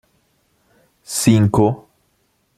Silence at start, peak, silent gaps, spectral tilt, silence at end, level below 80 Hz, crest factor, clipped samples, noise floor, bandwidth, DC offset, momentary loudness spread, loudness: 1.1 s; 0 dBFS; none; -6 dB/octave; 0.8 s; -46 dBFS; 20 dB; under 0.1%; -64 dBFS; 14.5 kHz; under 0.1%; 12 LU; -16 LUFS